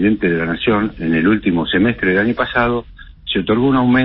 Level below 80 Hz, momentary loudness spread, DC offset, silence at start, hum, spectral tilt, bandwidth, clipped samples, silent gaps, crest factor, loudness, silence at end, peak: -38 dBFS; 5 LU; under 0.1%; 0 s; none; -11.5 dB/octave; 5.4 kHz; under 0.1%; none; 14 dB; -16 LUFS; 0 s; -2 dBFS